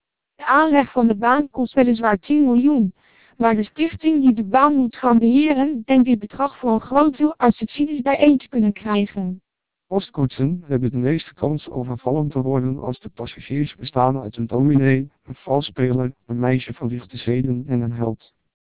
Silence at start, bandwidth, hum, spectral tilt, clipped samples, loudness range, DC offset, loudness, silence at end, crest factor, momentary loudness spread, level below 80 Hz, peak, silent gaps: 0.4 s; 4 kHz; none; -11.5 dB/octave; under 0.1%; 6 LU; 0.4%; -19 LUFS; 0.45 s; 16 dB; 11 LU; -50 dBFS; -2 dBFS; none